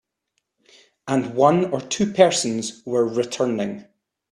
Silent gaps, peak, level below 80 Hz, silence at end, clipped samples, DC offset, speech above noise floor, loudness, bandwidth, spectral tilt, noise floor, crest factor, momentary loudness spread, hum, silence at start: none; 0 dBFS; -64 dBFS; 0.5 s; under 0.1%; under 0.1%; 55 dB; -21 LUFS; 12.5 kHz; -4.5 dB/octave; -75 dBFS; 22 dB; 11 LU; none; 1.05 s